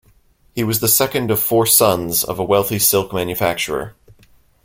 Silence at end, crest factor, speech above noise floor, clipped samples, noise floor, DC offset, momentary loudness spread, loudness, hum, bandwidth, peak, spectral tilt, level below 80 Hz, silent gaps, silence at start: 0.75 s; 18 dB; 37 dB; under 0.1%; -54 dBFS; under 0.1%; 11 LU; -16 LUFS; none; 16.5 kHz; 0 dBFS; -3.5 dB/octave; -48 dBFS; none; 0.55 s